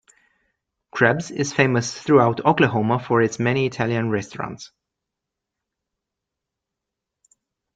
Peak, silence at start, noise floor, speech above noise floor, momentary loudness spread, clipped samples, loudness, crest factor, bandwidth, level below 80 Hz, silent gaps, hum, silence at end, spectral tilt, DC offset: 0 dBFS; 0.95 s; -84 dBFS; 64 dB; 14 LU; under 0.1%; -20 LUFS; 22 dB; 9 kHz; -60 dBFS; none; none; 3.1 s; -5.5 dB/octave; under 0.1%